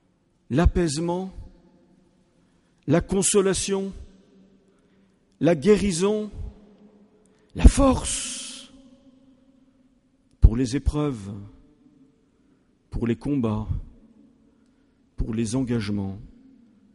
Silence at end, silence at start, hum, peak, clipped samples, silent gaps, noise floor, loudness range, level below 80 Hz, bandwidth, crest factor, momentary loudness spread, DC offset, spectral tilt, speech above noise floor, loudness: 0.7 s; 0.5 s; none; 0 dBFS; under 0.1%; none; -65 dBFS; 8 LU; -30 dBFS; 11.5 kHz; 26 dB; 19 LU; under 0.1%; -5.5 dB/octave; 43 dB; -24 LUFS